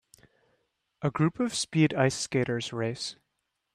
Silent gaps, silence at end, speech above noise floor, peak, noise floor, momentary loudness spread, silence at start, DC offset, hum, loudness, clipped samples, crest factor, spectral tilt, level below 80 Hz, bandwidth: none; 0.6 s; 53 dB; -10 dBFS; -81 dBFS; 9 LU; 1 s; under 0.1%; none; -28 LUFS; under 0.1%; 20 dB; -5 dB/octave; -64 dBFS; 13 kHz